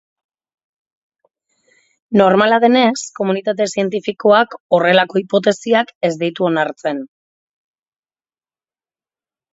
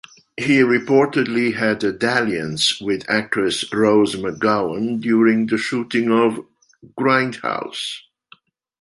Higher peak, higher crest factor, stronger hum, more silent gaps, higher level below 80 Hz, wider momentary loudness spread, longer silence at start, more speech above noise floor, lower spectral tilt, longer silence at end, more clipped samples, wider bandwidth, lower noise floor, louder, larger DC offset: about the same, 0 dBFS vs -2 dBFS; about the same, 18 dB vs 18 dB; neither; first, 4.60-4.70 s, 5.95-6.01 s vs none; second, -66 dBFS vs -58 dBFS; about the same, 9 LU vs 9 LU; first, 2.1 s vs 0.4 s; first, over 75 dB vs 34 dB; about the same, -5 dB/octave vs -4.5 dB/octave; first, 2.45 s vs 0.85 s; neither; second, 8 kHz vs 11.5 kHz; first, under -90 dBFS vs -52 dBFS; first, -15 LUFS vs -19 LUFS; neither